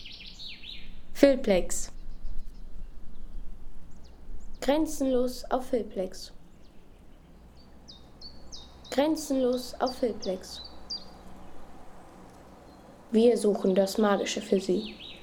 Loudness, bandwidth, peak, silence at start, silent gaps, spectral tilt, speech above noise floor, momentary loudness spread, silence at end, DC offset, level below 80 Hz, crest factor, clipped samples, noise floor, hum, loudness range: -28 LUFS; 18.5 kHz; -6 dBFS; 0 s; none; -4.5 dB/octave; 25 dB; 26 LU; 0 s; under 0.1%; -44 dBFS; 24 dB; under 0.1%; -51 dBFS; none; 9 LU